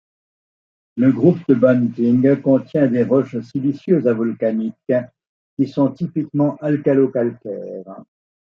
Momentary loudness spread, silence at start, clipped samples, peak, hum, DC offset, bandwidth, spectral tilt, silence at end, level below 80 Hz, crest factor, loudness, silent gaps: 15 LU; 0.95 s; under 0.1%; -2 dBFS; none; under 0.1%; 5.8 kHz; -10.5 dB/octave; 0.6 s; -64 dBFS; 16 dB; -18 LUFS; 5.27-5.57 s